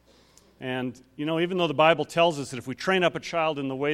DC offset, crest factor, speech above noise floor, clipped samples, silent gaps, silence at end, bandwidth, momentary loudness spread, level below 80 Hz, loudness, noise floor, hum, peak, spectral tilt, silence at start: under 0.1%; 22 dB; 32 dB; under 0.1%; none; 0 s; 15 kHz; 13 LU; -64 dBFS; -25 LUFS; -58 dBFS; none; -4 dBFS; -5 dB/octave; 0.6 s